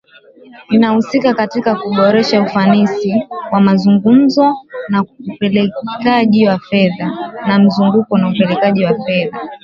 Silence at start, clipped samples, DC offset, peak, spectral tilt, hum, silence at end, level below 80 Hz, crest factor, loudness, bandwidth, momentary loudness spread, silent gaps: 0.6 s; under 0.1%; under 0.1%; 0 dBFS; -7.5 dB/octave; none; 0.1 s; -54 dBFS; 12 dB; -13 LUFS; 7 kHz; 8 LU; none